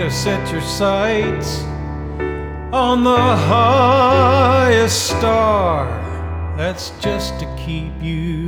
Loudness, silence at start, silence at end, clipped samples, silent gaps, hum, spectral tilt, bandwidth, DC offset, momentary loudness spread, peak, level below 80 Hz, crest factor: -16 LUFS; 0 s; 0 s; under 0.1%; none; none; -5 dB/octave; over 20 kHz; under 0.1%; 13 LU; -2 dBFS; -30 dBFS; 14 dB